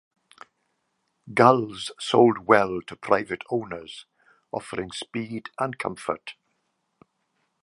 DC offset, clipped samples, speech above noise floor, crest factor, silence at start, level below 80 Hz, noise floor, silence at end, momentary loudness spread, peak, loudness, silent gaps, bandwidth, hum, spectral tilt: under 0.1%; under 0.1%; 51 dB; 24 dB; 1.25 s; -64 dBFS; -75 dBFS; 1.3 s; 17 LU; -2 dBFS; -24 LUFS; none; 11.5 kHz; none; -5.5 dB/octave